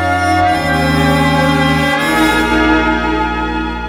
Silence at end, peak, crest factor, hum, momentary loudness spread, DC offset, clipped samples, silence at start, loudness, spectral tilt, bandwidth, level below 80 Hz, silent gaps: 0 s; 0 dBFS; 12 dB; none; 4 LU; under 0.1%; under 0.1%; 0 s; -12 LUFS; -5.5 dB/octave; 17 kHz; -28 dBFS; none